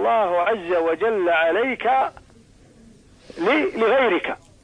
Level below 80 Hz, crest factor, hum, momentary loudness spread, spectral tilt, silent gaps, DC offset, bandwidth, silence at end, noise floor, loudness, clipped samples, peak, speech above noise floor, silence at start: -56 dBFS; 14 dB; none; 5 LU; -5.5 dB/octave; none; under 0.1%; 10 kHz; 0.3 s; -51 dBFS; -20 LUFS; under 0.1%; -8 dBFS; 31 dB; 0 s